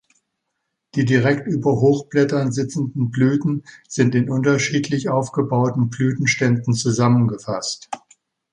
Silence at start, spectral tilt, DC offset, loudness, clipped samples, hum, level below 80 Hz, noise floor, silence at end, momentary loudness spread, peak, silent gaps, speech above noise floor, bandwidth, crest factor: 0.95 s; -6 dB/octave; under 0.1%; -19 LUFS; under 0.1%; none; -56 dBFS; -77 dBFS; 0.55 s; 8 LU; -2 dBFS; none; 58 dB; 10.5 kHz; 16 dB